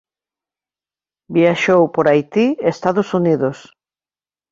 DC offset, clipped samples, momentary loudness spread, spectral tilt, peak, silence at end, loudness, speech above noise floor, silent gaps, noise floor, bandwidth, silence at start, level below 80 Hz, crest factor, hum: under 0.1%; under 0.1%; 5 LU; -7 dB/octave; -2 dBFS; 0.95 s; -16 LUFS; over 75 dB; none; under -90 dBFS; 7.6 kHz; 1.3 s; -60 dBFS; 16 dB; none